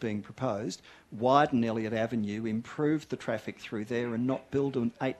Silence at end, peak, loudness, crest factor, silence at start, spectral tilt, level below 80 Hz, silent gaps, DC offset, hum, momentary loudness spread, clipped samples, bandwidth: 0 s; -10 dBFS; -31 LUFS; 20 dB; 0 s; -6.5 dB/octave; -66 dBFS; none; under 0.1%; none; 12 LU; under 0.1%; 12 kHz